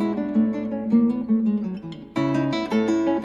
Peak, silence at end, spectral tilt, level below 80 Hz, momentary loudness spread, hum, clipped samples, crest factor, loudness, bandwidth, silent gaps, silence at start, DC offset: -10 dBFS; 0 s; -7.5 dB/octave; -56 dBFS; 8 LU; none; under 0.1%; 14 dB; -23 LUFS; 7.4 kHz; none; 0 s; under 0.1%